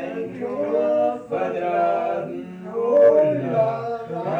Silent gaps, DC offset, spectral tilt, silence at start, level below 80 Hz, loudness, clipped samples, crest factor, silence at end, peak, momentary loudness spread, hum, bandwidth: none; under 0.1%; -8.5 dB/octave; 0 s; -66 dBFS; -21 LUFS; under 0.1%; 16 dB; 0 s; -6 dBFS; 14 LU; none; 6.6 kHz